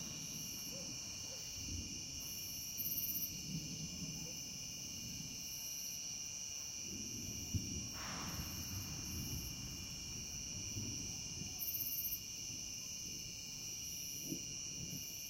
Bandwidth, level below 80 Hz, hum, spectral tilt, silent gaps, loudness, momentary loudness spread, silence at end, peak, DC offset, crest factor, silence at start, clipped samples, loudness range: 16.5 kHz; -60 dBFS; none; -2 dB/octave; none; -43 LUFS; 5 LU; 0 s; -26 dBFS; under 0.1%; 18 dB; 0 s; under 0.1%; 2 LU